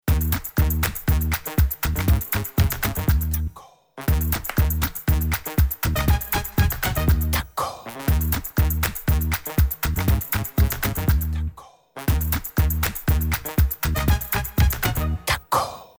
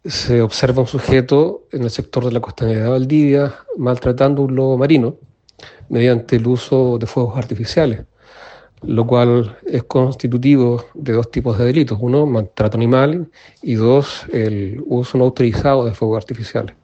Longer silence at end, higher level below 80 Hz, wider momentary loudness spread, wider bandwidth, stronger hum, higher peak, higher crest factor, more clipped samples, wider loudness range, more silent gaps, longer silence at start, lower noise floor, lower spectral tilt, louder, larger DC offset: about the same, 0.15 s vs 0.15 s; first, -26 dBFS vs -42 dBFS; second, 3 LU vs 9 LU; first, over 20 kHz vs 8.4 kHz; neither; second, -6 dBFS vs 0 dBFS; about the same, 16 dB vs 16 dB; neither; about the same, 1 LU vs 2 LU; neither; about the same, 0.05 s vs 0.05 s; about the same, -46 dBFS vs -43 dBFS; second, -5 dB/octave vs -7.5 dB/octave; second, -23 LUFS vs -16 LUFS; neither